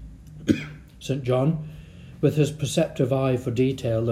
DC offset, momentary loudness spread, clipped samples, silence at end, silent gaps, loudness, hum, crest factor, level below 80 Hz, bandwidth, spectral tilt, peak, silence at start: under 0.1%; 17 LU; under 0.1%; 0 s; none; -24 LUFS; none; 20 dB; -48 dBFS; 15 kHz; -7 dB/octave; -4 dBFS; 0 s